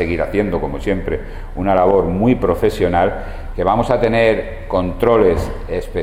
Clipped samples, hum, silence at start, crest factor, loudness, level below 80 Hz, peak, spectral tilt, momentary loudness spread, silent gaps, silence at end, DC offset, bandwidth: under 0.1%; none; 0 s; 16 dB; -17 LUFS; -28 dBFS; 0 dBFS; -7.5 dB/octave; 10 LU; none; 0 s; under 0.1%; 15.5 kHz